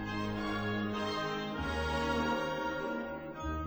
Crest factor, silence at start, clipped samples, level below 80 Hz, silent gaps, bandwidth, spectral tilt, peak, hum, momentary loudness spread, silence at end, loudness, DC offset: 14 dB; 0 s; under 0.1%; -48 dBFS; none; over 20 kHz; -5.5 dB/octave; -20 dBFS; none; 6 LU; 0 s; -35 LUFS; under 0.1%